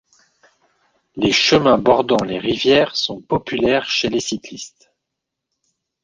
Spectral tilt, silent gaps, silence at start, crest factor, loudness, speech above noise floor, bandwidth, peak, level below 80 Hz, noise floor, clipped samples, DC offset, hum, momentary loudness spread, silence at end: -4 dB/octave; none; 1.15 s; 18 dB; -17 LUFS; 63 dB; 9.8 kHz; 0 dBFS; -50 dBFS; -80 dBFS; under 0.1%; under 0.1%; none; 16 LU; 1.35 s